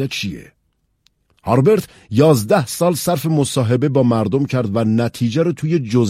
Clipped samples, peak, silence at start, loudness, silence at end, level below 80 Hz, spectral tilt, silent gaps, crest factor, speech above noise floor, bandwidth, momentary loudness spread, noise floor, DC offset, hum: under 0.1%; 0 dBFS; 0 s; -17 LUFS; 0 s; -52 dBFS; -6.5 dB/octave; none; 16 dB; 50 dB; 16 kHz; 8 LU; -66 dBFS; under 0.1%; none